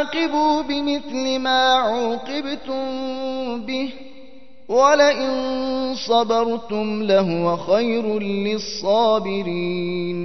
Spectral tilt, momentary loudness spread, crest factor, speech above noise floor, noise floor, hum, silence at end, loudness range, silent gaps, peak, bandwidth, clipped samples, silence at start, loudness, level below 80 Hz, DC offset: -4.5 dB/octave; 10 LU; 18 dB; 27 dB; -47 dBFS; none; 0 s; 3 LU; none; -2 dBFS; 6.2 kHz; under 0.1%; 0 s; -20 LUFS; -54 dBFS; 1%